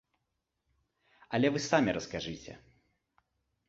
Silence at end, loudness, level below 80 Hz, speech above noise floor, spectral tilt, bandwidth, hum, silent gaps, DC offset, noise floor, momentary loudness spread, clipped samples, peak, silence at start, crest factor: 1.1 s; -31 LUFS; -64 dBFS; 52 dB; -5 dB/octave; 8 kHz; none; none; under 0.1%; -84 dBFS; 16 LU; under 0.1%; -10 dBFS; 1.3 s; 24 dB